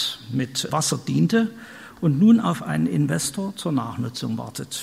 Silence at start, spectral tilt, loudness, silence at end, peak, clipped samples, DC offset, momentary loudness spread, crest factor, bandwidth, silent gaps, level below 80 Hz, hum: 0 s; -5 dB/octave; -22 LUFS; 0 s; -6 dBFS; under 0.1%; under 0.1%; 12 LU; 16 dB; 15.5 kHz; none; -60 dBFS; none